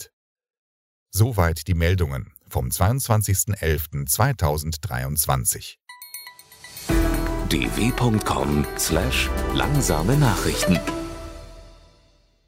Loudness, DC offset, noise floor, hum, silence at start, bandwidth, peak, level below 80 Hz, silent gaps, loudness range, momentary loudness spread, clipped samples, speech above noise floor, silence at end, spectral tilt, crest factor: -22 LUFS; under 0.1%; -58 dBFS; none; 0 s; 16.5 kHz; -4 dBFS; -32 dBFS; 0.13-0.36 s, 0.58-1.06 s; 3 LU; 17 LU; under 0.1%; 37 dB; 0.75 s; -4.5 dB/octave; 20 dB